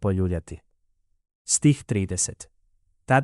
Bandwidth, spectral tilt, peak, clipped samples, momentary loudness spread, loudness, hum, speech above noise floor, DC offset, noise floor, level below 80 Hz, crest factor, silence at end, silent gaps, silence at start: 12 kHz; -5 dB/octave; -6 dBFS; under 0.1%; 23 LU; -24 LUFS; none; 44 dB; under 0.1%; -68 dBFS; -48 dBFS; 18 dB; 0 s; 1.35-1.45 s; 0 s